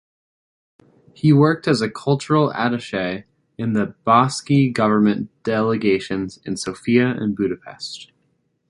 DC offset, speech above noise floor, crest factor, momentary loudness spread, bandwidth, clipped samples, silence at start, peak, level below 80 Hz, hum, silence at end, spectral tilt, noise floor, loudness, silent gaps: under 0.1%; 48 dB; 18 dB; 12 LU; 11.5 kHz; under 0.1%; 1.25 s; -2 dBFS; -56 dBFS; none; 0.65 s; -6.5 dB/octave; -67 dBFS; -19 LUFS; none